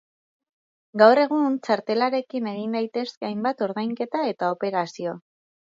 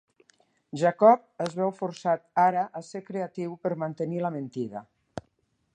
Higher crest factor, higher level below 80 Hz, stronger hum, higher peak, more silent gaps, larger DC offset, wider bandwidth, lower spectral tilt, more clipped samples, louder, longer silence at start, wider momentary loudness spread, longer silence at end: about the same, 22 dB vs 22 dB; second, -78 dBFS vs -70 dBFS; neither; first, -2 dBFS vs -6 dBFS; first, 3.17-3.21 s vs none; neither; second, 7.6 kHz vs 9.8 kHz; about the same, -6 dB/octave vs -7 dB/octave; neither; first, -23 LUFS vs -27 LUFS; first, 0.95 s vs 0.75 s; second, 13 LU vs 21 LU; about the same, 0.55 s vs 0.55 s